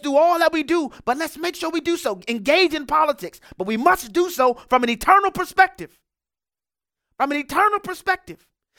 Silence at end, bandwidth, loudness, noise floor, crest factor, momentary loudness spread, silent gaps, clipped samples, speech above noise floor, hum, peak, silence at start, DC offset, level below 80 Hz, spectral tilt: 0.45 s; 18 kHz; -20 LUFS; under -90 dBFS; 20 dB; 10 LU; none; under 0.1%; over 70 dB; none; -2 dBFS; 0.05 s; under 0.1%; -52 dBFS; -3.5 dB/octave